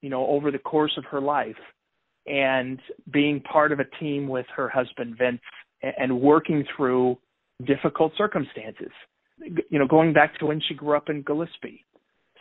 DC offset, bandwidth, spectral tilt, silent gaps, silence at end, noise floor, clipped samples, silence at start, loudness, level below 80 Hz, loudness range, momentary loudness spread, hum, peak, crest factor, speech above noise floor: under 0.1%; 4.1 kHz; -10 dB/octave; none; 0.65 s; -64 dBFS; under 0.1%; 0.05 s; -24 LUFS; -66 dBFS; 2 LU; 16 LU; none; -2 dBFS; 22 dB; 40 dB